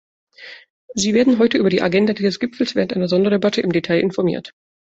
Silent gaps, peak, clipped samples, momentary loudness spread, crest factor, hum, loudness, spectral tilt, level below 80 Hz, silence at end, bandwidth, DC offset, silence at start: 0.70-0.88 s; -4 dBFS; under 0.1%; 14 LU; 14 dB; none; -18 LUFS; -5.5 dB/octave; -56 dBFS; 0.4 s; 8.2 kHz; under 0.1%; 0.4 s